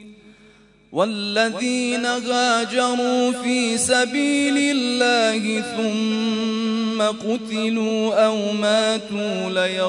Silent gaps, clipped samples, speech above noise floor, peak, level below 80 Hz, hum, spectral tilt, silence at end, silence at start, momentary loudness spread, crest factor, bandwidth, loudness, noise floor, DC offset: none; under 0.1%; 31 dB; -4 dBFS; -64 dBFS; none; -3 dB/octave; 0 s; 0 s; 5 LU; 16 dB; 11 kHz; -20 LUFS; -51 dBFS; under 0.1%